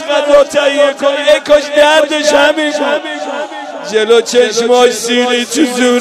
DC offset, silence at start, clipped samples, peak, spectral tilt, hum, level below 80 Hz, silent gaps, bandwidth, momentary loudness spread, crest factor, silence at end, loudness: under 0.1%; 0 s; 1%; 0 dBFS; -1.5 dB/octave; none; -50 dBFS; none; 14.5 kHz; 9 LU; 10 dB; 0 s; -10 LUFS